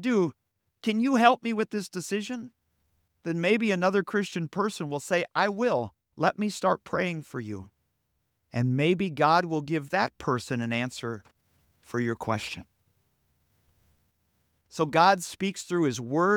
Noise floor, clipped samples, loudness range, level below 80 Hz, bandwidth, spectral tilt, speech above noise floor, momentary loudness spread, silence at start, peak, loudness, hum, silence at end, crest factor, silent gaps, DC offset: -77 dBFS; under 0.1%; 7 LU; -68 dBFS; 17.5 kHz; -5.5 dB/octave; 50 dB; 15 LU; 0 s; -4 dBFS; -27 LUFS; none; 0 s; 24 dB; none; under 0.1%